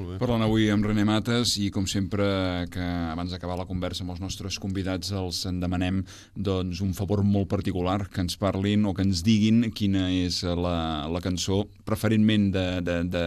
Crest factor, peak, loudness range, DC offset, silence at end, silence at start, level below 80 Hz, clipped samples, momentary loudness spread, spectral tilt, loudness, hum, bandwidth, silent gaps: 16 dB; -10 dBFS; 5 LU; under 0.1%; 0 s; 0 s; -46 dBFS; under 0.1%; 9 LU; -5.5 dB/octave; -26 LUFS; none; 13 kHz; none